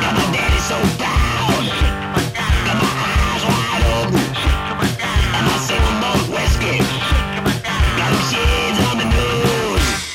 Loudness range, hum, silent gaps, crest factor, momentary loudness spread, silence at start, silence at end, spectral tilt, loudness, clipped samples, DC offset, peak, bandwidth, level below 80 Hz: 1 LU; none; none; 12 dB; 3 LU; 0 s; 0 s; -4.5 dB/octave; -17 LUFS; under 0.1%; under 0.1%; -6 dBFS; 16.5 kHz; -22 dBFS